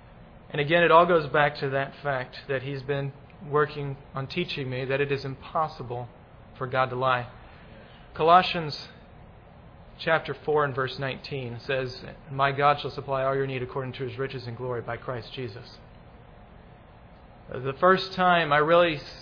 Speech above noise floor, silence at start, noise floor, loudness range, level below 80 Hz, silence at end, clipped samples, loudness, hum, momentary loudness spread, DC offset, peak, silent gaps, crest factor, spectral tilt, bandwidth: 24 dB; 0.05 s; -50 dBFS; 8 LU; -54 dBFS; 0 s; under 0.1%; -26 LUFS; none; 17 LU; under 0.1%; -4 dBFS; none; 22 dB; -7 dB/octave; 5.4 kHz